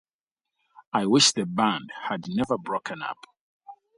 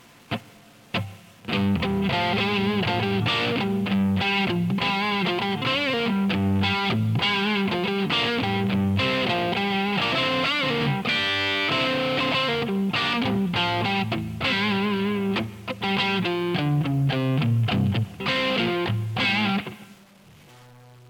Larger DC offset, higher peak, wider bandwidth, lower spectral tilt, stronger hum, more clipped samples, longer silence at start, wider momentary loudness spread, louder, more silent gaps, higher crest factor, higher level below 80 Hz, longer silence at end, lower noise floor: neither; first, -6 dBFS vs -12 dBFS; second, 11.5 kHz vs 18.5 kHz; second, -3 dB/octave vs -6 dB/octave; neither; neither; first, 0.95 s vs 0.3 s; first, 15 LU vs 4 LU; about the same, -25 LUFS vs -23 LUFS; first, 3.39-3.60 s vs none; first, 22 dB vs 12 dB; second, -64 dBFS vs -54 dBFS; second, 0.25 s vs 0.45 s; first, -89 dBFS vs -51 dBFS